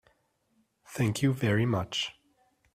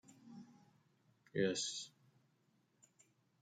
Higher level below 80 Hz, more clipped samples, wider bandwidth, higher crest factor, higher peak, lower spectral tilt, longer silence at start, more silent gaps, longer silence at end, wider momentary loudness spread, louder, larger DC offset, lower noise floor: first, -62 dBFS vs under -90 dBFS; neither; first, 15.5 kHz vs 9.6 kHz; second, 16 dB vs 24 dB; first, -14 dBFS vs -24 dBFS; first, -5.5 dB/octave vs -3.5 dB/octave; first, 0.9 s vs 0.1 s; neither; second, 0.65 s vs 1.55 s; second, 9 LU vs 21 LU; first, -29 LUFS vs -40 LUFS; neither; second, -73 dBFS vs -78 dBFS